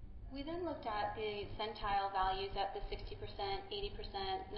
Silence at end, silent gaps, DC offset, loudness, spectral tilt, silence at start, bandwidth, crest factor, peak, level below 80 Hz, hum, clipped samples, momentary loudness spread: 0 s; none; under 0.1%; -41 LUFS; -2.5 dB/octave; 0 s; 5.6 kHz; 16 dB; -24 dBFS; -50 dBFS; none; under 0.1%; 10 LU